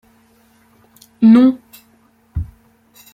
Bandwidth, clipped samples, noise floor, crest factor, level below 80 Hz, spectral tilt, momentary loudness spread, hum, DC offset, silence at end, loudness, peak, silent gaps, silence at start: 14.5 kHz; under 0.1%; -54 dBFS; 16 dB; -40 dBFS; -8 dB/octave; 21 LU; none; under 0.1%; 0.7 s; -11 LUFS; -2 dBFS; none; 1.2 s